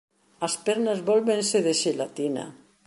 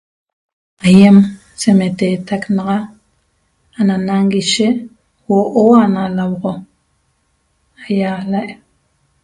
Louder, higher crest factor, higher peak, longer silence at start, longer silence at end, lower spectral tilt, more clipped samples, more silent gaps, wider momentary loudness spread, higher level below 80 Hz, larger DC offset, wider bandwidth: second, -25 LUFS vs -13 LUFS; about the same, 16 dB vs 14 dB; second, -10 dBFS vs 0 dBFS; second, 0.4 s vs 0.85 s; second, 0.35 s vs 0.7 s; second, -3.5 dB/octave vs -6 dB/octave; second, under 0.1% vs 0.2%; neither; second, 9 LU vs 13 LU; second, -74 dBFS vs -52 dBFS; neither; about the same, 11.5 kHz vs 11.5 kHz